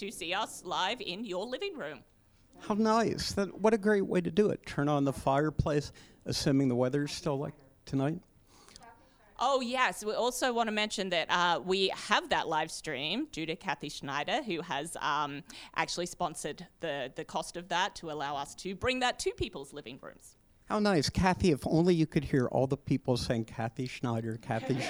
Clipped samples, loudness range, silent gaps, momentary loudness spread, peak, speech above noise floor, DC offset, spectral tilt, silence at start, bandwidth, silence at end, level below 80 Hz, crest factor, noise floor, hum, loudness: under 0.1%; 5 LU; none; 10 LU; -10 dBFS; 28 dB; under 0.1%; -5 dB/octave; 0 s; over 20 kHz; 0 s; -54 dBFS; 22 dB; -59 dBFS; none; -32 LUFS